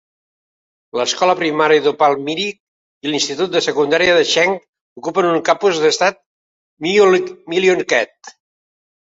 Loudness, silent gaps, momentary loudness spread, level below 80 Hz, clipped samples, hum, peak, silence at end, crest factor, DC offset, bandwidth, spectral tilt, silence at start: -15 LUFS; 2.60-3.01 s, 4.68-4.73 s, 4.81-4.96 s, 6.26-6.77 s; 10 LU; -60 dBFS; under 0.1%; none; -2 dBFS; 0.9 s; 16 dB; under 0.1%; 8 kHz; -3 dB/octave; 0.95 s